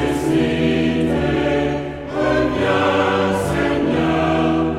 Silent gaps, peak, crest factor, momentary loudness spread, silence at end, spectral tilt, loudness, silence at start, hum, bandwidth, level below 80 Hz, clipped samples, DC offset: none; -2 dBFS; 14 dB; 3 LU; 0 s; -6.5 dB/octave; -18 LUFS; 0 s; none; 14 kHz; -36 dBFS; under 0.1%; under 0.1%